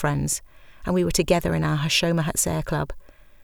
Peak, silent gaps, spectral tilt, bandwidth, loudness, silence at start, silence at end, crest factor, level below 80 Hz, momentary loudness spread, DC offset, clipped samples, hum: -6 dBFS; none; -4 dB/octave; over 20 kHz; -23 LUFS; 0 s; 0.4 s; 18 dB; -38 dBFS; 8 LU; under 0.1%; under 0.1%; none